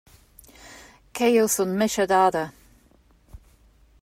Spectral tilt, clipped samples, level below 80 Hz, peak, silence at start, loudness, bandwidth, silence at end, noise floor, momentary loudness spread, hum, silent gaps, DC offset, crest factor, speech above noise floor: -4 dB/octave; under 0.1%; -56 dBFS; -8 dBFS; 0.65 s; -21 LUFS; 16 kHz; 0.65 s; -58 dBFS; 20 LU; none; none; under 0.1%; 18 dB; 37 dB